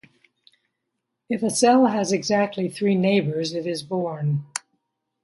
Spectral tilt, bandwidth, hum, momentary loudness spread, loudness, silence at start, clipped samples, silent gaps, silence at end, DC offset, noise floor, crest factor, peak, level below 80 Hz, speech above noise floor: -5 dB/octave; 11.5 kHz; none; 11 LU; -22 LUFS; 1.3 s; under 0.1%; none; 0.65 s; under 0.1%; -79 dBFS; 18 dB; -4 dBFS; -70 dBFS; 58 dB